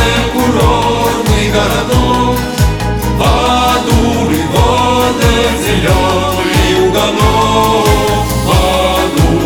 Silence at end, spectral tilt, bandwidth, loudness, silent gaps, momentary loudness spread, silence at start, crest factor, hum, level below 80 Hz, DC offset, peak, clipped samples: 0 s; -5 dB/octave; over 20 kHz; -11 LUFS; none; 3 LU; 0 s; 10 dB; none; -18 dBFS; under 0.1%; 0 dBFS; under 0.1%